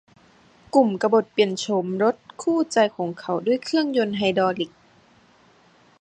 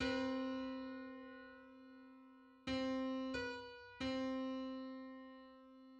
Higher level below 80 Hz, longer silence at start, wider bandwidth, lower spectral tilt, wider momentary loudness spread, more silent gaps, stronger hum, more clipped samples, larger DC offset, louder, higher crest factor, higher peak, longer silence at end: about the same, -66 dBFS vs -68 dBFS; first, 0.75 s vs 0 s; first, 10 kHz vs 8.6 kHz; about the same, -5 dB/octave vs -5 dB/octave; second, 7 LU vs 19 LU; neither; neither; neither; neither; first, -22 LUFS vs -45 LUFS; about the same, 20 dB vs 18 dB; first, -4 dBFS vs -28 dBFS; first, 1.35 s vs 0 s